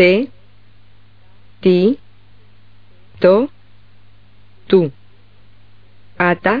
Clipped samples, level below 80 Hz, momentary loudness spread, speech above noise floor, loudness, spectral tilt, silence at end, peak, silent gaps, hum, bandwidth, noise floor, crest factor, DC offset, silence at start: under 0.1%; -56 dBFS; 11 LU; 37 dB; -16 LUFS; -5 dB/octave; 0 s; 0 dBFS; none; 50 Hz at -45 dBFS; 5 kHz; -50 dBFS; 18 dB; 1%; 0 s